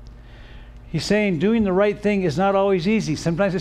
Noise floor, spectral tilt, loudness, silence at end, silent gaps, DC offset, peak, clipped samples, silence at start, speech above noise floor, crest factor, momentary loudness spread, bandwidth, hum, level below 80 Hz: -41 dBFS; -6.5 dB/octave; -20 LUFS; 0 s; none; under 0.1%; -8 dBFS; under 0.1%; 0 s; 21 dB; 14 dB; 4 LU; 12 kHz; none; -42 dBFS